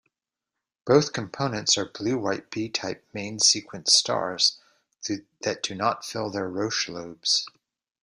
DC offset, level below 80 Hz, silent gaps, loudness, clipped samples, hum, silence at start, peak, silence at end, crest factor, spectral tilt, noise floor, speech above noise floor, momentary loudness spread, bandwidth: under 0.1%; -66 dBFS; none; -25 LUFS; under 0.1%; none; 0.85 s; -4 dBFS; 0.55 s; 24 dB; -2.5 dB/octave; -87 dBFS; 61 dB; 13 LU; 13.5 kHz